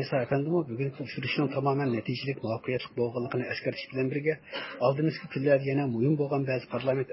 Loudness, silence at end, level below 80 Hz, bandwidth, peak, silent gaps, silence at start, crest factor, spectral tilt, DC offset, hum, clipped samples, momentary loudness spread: -30 LUFS; 0 s; -68 dBFS; 5.8 kHz; -12 dBFS; none; 0 s; 16 dB; -11 dB/octave; under 0.1%; none; under 0.1%; 7 LU